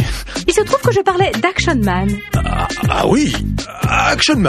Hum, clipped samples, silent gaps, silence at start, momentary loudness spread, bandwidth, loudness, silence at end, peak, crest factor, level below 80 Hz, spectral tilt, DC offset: none; under 0.1%; none; 0 s; 6 LU; 15 kHz; -15 LUFS; 0 s; 0 dBFS; 14 dB; -26 dBFS; -5 dB/octave; under 0.1%